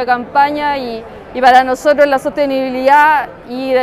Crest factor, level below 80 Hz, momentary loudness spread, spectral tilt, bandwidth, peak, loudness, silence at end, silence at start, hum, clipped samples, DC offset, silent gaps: 12 dB; -46 dBFS; 15 LU; -4 dB/octave; 14.5 kHz; 0 dBFS; -12 LUFS; 0 s; 0 s; none; 0.2%; under 0.1%; none